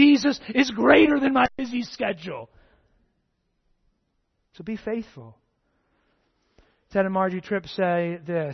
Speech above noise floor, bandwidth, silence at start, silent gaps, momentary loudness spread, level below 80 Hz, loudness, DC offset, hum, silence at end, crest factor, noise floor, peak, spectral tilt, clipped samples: 51 dB; 6.4 kHz; 0 s; none; 17 LU; -56 dBFS; -23 LUFS; under 0.1%; none; 0 s; 22 dB; -73 dBFS; -2 dBFS; -5.5 dB/octave; under 0.1%